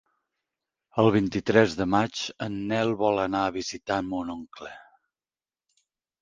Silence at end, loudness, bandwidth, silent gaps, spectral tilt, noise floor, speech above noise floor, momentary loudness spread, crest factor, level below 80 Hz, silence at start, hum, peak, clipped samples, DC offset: 1.4 s; -26 LUFS; 9.6 kHz; none; -5.5 dB/octave; under -90 dBFS; over 65 dB; 14 LU; 24 dB; -56 dBFS; 0.95 s; none; -4 dBFS; under 0.1%; under 0.1%